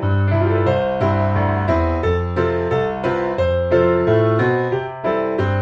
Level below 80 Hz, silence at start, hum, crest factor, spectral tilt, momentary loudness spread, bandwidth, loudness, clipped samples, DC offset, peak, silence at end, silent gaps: -36 dBFS; 0 s; none; 14 dB; -9 dB/octave; 5 LU; 6.2 kHz; -18 LUFS; under 0.1%; under 0.1%; -4 dBFS; 0 s; none